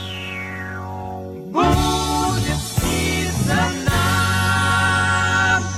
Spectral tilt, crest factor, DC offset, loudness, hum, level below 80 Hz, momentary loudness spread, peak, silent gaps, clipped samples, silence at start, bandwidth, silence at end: -4 dB/octave; 16 dB; under 0.1%; -19 LUFS; none; -32 dBFS; 12 LU; -4 dBFS; none; under 0.1%; 0 s; 16 kHz; 0 s